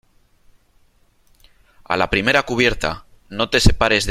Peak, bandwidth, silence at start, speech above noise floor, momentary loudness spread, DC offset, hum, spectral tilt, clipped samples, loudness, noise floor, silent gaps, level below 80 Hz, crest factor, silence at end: -2 dBFS; 14.5 kHz; 1.9 s; 40 dB; 10 LU; under 0.1%; none; -4 dB/octave; under 0.1%; -18 LUFS; -57 dBFS; none; -30 dBFS; 18 dB; 0 s